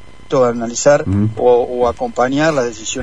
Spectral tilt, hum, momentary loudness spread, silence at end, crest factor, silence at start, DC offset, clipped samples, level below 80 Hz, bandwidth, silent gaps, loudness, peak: -5 dB/octave; none; 5 LU; 0 s; 14 dB; 0.3 s; 2%; under 0.1%; -42 dBFS; 10 kHz; none; -15 LUFS; 0 dBFS